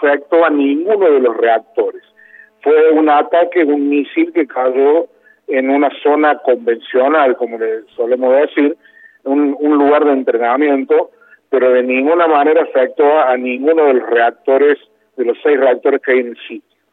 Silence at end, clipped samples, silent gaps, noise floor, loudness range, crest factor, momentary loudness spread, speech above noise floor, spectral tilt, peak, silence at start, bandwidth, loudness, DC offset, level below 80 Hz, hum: 0.35 s; under 0.1%; none; -43 dBFS; 2 LU; 12 dB; 8 LU; 31 dB; -7.5 dB/octave; -2 dBFS; 0 s; 4.1 kHz; -13 LUFS; under 0.1%; -74 dBFS; none